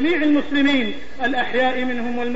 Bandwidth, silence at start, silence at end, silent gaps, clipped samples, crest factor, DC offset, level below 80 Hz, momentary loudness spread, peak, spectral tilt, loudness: 8 kHz; 0 s; 0 s; none; under 0.1%; 12 dB; 5%; -48 dBFS; 7 LU; -8 dBFS; -5 dB/octave; -20 LUFS